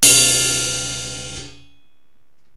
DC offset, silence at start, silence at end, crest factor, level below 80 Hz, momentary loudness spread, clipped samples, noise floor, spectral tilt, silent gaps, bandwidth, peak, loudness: 0.9%; 0 s; 1.05 s; 20 dB; -46 dBFS; 20 LU; under 0.1%; -66 dBFS; -0.5 dB/octave; none; 16 kHz; 0 dBFS; -15 LUFS